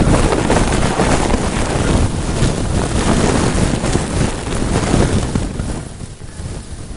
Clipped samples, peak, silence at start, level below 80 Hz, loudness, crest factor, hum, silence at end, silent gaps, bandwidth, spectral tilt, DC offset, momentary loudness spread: under 0.1%; 0 dBFS; 0 s; -22 dBFS; -16 LUFS; 16 dB; none; 0 s; none; 11.5 kHz; -5.5 dB/octave; under 0.1%; 14 LU